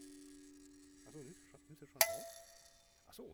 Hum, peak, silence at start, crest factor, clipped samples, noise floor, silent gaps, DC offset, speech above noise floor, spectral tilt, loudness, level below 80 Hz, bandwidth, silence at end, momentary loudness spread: none; -10 dBFS; 0 s; 34 dB; under 0.1%; -66 dBFS; none; under 0.1%; 24 dB; -0.5 dB/octave; -35 LUFS; -74 dBFS; over 20 kHz; 0 s; 27 LU